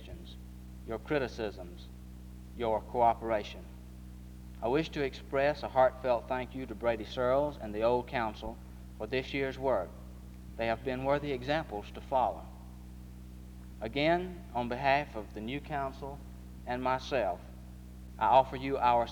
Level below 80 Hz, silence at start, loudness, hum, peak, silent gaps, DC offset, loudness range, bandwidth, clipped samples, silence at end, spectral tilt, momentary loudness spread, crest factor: -48 dBFS; 0 s; -32 LUFS; none; -12 dBFS; none; under 0.1%; 4 LU; over 20 kHz; under 0.1%; 0 s; -6.5 dB/octave; 21 LU; 22 dB